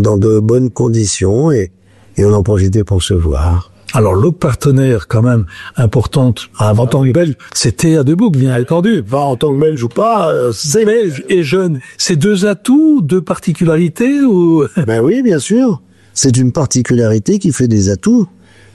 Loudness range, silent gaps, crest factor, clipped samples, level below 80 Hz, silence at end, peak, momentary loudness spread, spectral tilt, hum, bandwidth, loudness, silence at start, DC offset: 1 LU; none; 8 dB; under 0.1%; -30 dBFS; 0.45 s; -2 dBFS; 5 LU; -6 dB/octave; none; 12.5 kHz; -12 LUFS; 0 s; under 0.1%